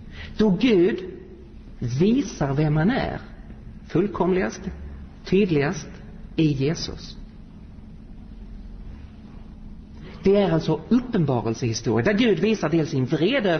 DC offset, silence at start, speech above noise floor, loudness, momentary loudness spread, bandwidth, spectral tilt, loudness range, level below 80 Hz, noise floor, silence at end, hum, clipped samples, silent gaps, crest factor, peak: 0.1%; 0 s; 21 dB; -22 LUFS; 23 LU; 6.6 kHz; -6.5 dB/octave; 8 LU; -42 dBFS; -42 dBFS; 0 s; none; under 0.1%; none; 16 dB; -8 dBFS